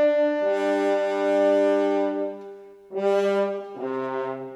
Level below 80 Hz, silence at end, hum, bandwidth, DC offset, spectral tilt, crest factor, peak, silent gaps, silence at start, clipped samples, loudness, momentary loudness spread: -76 dBFS; 0 s; 50 Hz at -75 dBFS; 10 kHz; under 0.1%; -6 dB/octave; 12 dB; -12 dBFS; none; 0 s; under 0.1%; -24 LUFS; 11 LU